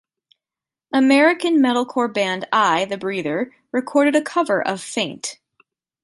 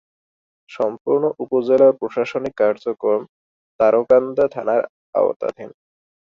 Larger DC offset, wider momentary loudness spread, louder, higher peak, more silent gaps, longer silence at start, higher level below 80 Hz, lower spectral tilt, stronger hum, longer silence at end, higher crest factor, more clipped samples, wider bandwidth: neither; about the same, 10 LU vs 10 LU; about the same, -19 LUFS vs -19 LUFS; about the same, -4 dBFS vs -2 dBFS; second, none vs 1.01-1.05 s, 3.29-3.79 s, 4.89-5.13 s, 5.36-5.40 s; first, 0.95 s vs 0.7 s; second, -70 dBFS vs -62 dBFS; second, -4 dB/octave vs -7.5 dB/octave; neither; about the same, 0.7 s vs 0.7 s; about the same, 16 dB vs 16 dB; neither; first, 11.5 kHz vs 6.8 kHz